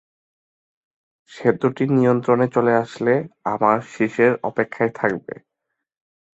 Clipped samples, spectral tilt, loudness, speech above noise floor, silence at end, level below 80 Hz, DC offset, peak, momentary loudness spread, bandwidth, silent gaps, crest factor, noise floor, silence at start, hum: under 0.1%; -8 dB/octave; -20 LUFS; 60 dB; 1.2 s; -64 dBFS; under 0.1%; -2 dBFS; 7 LU; 8 kHz; none; 20 dB; -80 dBFS; 1.3 s; none